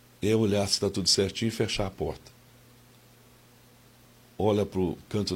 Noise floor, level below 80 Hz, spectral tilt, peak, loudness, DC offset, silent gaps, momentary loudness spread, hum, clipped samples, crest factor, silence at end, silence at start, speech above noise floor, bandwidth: -56 dBFS; -52 dBFS; -4.5 dB/octave; -10 dBFS; -27 LUFS; under 0.1%; none; 9 LU; none; under 0.1%; 20 dB; 0 s; 0.2 s; 29 dB; 16.5 kHz